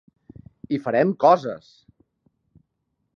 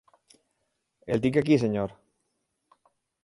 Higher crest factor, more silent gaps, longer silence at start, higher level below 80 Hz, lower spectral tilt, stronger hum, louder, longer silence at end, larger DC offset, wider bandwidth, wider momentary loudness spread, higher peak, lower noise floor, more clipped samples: about the same, 22 dB vs 20 dB; neither; second, 0.7 s vs 1.05 s; about the same, -64 dBFS vs -60 dBFS; about the same, -7.5 dB/octave vs -7.5 dB/octave; neither; first, -21 LUFS vs -26 LUFS; first, 1.6 s vs 1.3 s; neither; second, 7 kHz vs 11.5 kHz; first, 16 LU vs 13 LU; first, -4 dBFS vs -10 dBFS; about the same, -75 dBFS vs -78 dBFS; neither